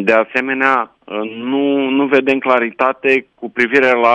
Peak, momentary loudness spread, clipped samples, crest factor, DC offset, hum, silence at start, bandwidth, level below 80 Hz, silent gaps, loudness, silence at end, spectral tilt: 0 dBFS; 10 LU; under 0.1%; 14 dB; under 0.1%; none; 0 s; 8.8 kHz; -62 dBFS; none; -15 LUFS; 0 s; -5.5 dB/octave